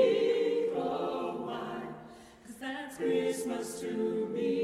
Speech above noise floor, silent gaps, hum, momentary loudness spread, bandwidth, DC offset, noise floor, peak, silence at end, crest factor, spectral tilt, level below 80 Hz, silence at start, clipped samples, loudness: 19 dB; none; none; 16 LU; 14.5 kHz; under 0.1%; -51 dBFS; -14 dBFS; 0 s; 18 dB; -5 dB/octave; -70 dBFS; 0 s; under 0.1%; -33 LUFS